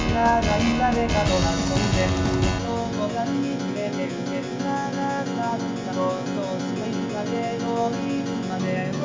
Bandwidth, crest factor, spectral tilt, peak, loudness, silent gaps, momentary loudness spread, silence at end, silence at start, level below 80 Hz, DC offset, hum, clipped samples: 7.6 kHz; 16 dB; -5.5 dB/octave; -6 dBFS; -24 LUFS; none; 7 LU; 0 s; 0 s; -36 dBFS; under 0.1%; none; under 0.1%